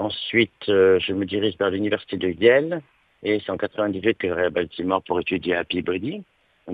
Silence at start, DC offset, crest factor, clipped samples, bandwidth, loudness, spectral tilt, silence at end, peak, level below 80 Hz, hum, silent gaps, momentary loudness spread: 0 s; under 0.1%; 20 dB; under 0.1%; 4.9 kHz; -22 LUFS; -8 dB/octave; 0 s; -4 dBFS; -58 dBFS; none; none; 10 LU